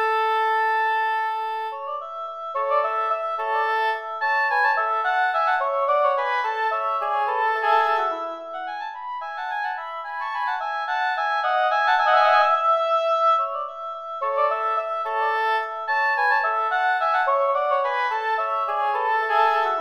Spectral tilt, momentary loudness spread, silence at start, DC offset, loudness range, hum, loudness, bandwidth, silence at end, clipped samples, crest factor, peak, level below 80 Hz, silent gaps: 0 dB/octave; 11 LU; 0 s; under 0.1%; 5 LU; none; -22 LUFS; 14 kHz; 0 s; under 0.1%; 16 dB; -6 dBFS; -76 dBFS; none